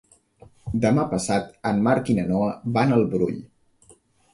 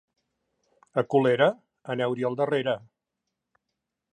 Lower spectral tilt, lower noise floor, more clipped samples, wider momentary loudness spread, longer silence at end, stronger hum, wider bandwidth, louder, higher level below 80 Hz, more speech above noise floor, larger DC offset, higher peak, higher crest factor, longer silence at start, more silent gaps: about the same, -6.5 dB/octave vs -7 dB/octave; second, -56 dBFS vs -84 dBFS; neither; second, 7 LU vs 11 LU; second, 0.9 s vs 1.35 s; neither; first, 11.5 kHz vs 9.6 kHz; first, -23 LUFS vs -26 LUFS; first, -50 dBFS vs -76 dBFS; second, 35 dB vs 59 dB; neither; about the same, -6 dBFS vs -8 dBFS; about the same, 18 dB vs 20 dB; second, 0.65 s vs 0.95 s; neither